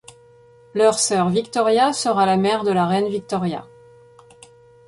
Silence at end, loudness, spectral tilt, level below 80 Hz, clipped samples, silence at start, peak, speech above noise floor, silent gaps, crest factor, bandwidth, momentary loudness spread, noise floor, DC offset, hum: 1.25 s; -19 LUFS; -4.5 dB/octave; -60 dBFS; under 0.1%; 0.75 s; -4 dBFS; 31 dB; none; 16 dB; 11.5 kHz; 8 LU; -50 dBFS; under 0.1%; none